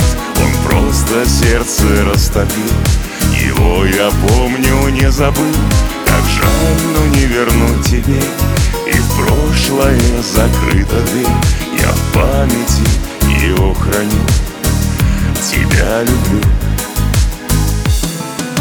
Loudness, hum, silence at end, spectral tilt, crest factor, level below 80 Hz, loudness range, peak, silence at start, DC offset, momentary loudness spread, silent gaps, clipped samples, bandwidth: -12 LUFS; none; 0 s; -5 dB/octave; 12 dB; -16 dBFS; 2 LU; 0 dBFS; 0 s; under 0.1%; 3 LU; none; under 0.1%; over 20 kHz